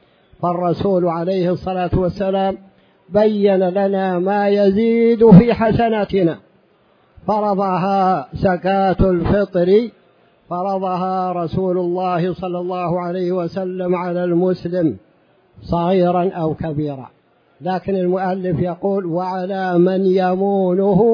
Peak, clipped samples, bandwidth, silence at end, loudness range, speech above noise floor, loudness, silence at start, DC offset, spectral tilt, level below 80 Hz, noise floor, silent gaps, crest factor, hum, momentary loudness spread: 0 dBFS; under 0.1%; 5.4 kHz; 0 s; 7 LU; 39 dB; -17 LUFS; 0.4 s; under 0.1%; -10 dB/octave; -40 dBFS; -55 dBFS; none; 16 dB; none; 8 LU